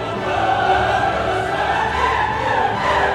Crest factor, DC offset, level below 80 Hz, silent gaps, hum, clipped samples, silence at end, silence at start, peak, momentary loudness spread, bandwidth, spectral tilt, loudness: 14 dB; under 0.1%; -36 dBFS; none; none; under 0.1%; 0 s; 0 s; -4 dBFS; 3 LU; 13 kHz; -5 dB/octave; -18 LUFS